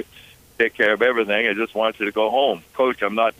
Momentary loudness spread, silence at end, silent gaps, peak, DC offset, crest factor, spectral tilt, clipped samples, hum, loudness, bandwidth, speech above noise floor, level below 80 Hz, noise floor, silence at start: 5 LU; 0.1 s; none; -4 dBFS; under 0.1%; 16 dB; -4.5 dB/octave; under 0.1%; none; -20 LUFS; 15.5 kHz; 28 dB; -60 dBFS; -48 dBFS; 0 s